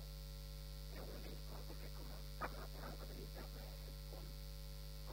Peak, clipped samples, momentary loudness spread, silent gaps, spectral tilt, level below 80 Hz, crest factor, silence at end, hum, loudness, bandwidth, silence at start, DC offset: -30 dBFS; under 0.1%; 4 LU; none; -4.5 dB/octave; -52 dBFS; 20 dB; 0 s; 50 Hz at -50 dBFS; -52 LUFS; 16 kHz; 0 s; under 0.1%